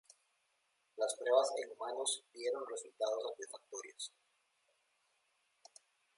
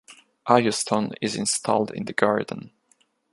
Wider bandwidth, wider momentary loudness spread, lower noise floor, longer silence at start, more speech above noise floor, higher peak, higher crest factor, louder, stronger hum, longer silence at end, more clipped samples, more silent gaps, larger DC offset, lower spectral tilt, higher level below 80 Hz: about the same, 11.5 kHz vs 11.5 kHz; first, 16 LU vs 12 LU; first, -80 dBFS vs -65 dBFS; first, 0.95 s vs 0.1 s; about the same, 41 dB vs 42 dB; second, -18 dBFS vs -2 dBFS; about the same, 24 dB vs 24 dB; second, -39 LUFS vs -23 LUFS; neither; first, 2.1 s vs 0.65 s; neither; neither; neither; second, 1 dB/octave vs -3.5 dB/octave; second, under -90 dBFS vs -66 dBFS